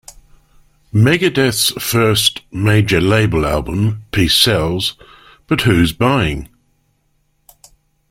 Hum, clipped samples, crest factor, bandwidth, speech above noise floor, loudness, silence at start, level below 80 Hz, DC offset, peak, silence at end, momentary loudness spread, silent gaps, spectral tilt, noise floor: none; under 0.1%; 16 dB; 16.5 kHz; 47 dB; -14 LUFS; 0.95 s; -36 dBFS; under 0.1%; 0 dBFS; 1.65 s; 8 LU; none; -4.5 dB/octave; -62 dBFS